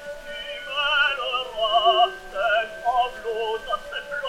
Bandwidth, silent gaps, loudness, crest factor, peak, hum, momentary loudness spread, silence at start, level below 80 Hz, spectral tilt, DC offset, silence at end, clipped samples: 14.5 kHz; none; -23 LUFS; 18 dB; -6 dBFS; none; 12 LU; 0 s; -50 dBFS; -1.5 dB/octave; under 0.1%; 0 s; under 0.1%